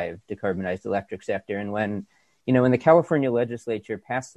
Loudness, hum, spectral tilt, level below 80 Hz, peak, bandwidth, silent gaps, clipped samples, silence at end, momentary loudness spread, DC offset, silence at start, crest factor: -24 LUFS; none; -7.5 dB/octave; -56 dBFS; -4 dBFS; 9.8 kHz; none; under 0.1%; 0.1 s; 13 LU; under 0.1%; 0 s; 20 dB